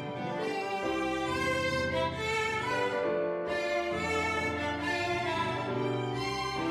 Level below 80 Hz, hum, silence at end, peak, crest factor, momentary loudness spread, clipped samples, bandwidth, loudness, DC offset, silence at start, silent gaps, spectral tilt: -54 dBFS; none; 0 s; -18 dBFS; 14 dB; 3 LU; under 0.1%; 15.5 kHz; -31 LUFS; under 0.1%; 0 s; none; -5 dB/octave